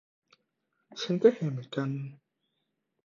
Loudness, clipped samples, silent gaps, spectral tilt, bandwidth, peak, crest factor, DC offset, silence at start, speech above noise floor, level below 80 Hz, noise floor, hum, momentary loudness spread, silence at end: -29 LUFS; under 0.1%; none; -7 dB/octave; 7.4 kHz; -10 dBFS; 22 dB; under 0.1%; 0.95 s; 52 dB; -78 dBFS; -81 dBFS; none; 18 LU; 0.9 s